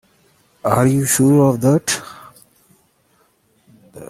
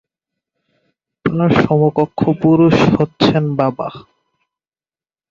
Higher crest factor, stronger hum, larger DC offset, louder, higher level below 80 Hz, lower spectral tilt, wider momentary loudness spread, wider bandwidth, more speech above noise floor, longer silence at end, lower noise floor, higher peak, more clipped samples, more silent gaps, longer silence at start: about the same, 18 dB vs 16 dB; neither; neither; about the same, -15 LUFS vs -14 LUFS; second, -54 dBFS vs -46 dBFS; second, -5.5 dB/octave vs -8 dB/octave; about the same, 11 LU vs 10 LU; first, 16 kHz vs 7.4 kHz; second, 45 dB vs over 77 dB; second, 0.05 s vs 1.3 s; second, -59 dBFS vs under -90 dBFS; about the same, -2 dBFS vs 0 dBFS; neither; neither; second, 0.65 s vs 1.25 s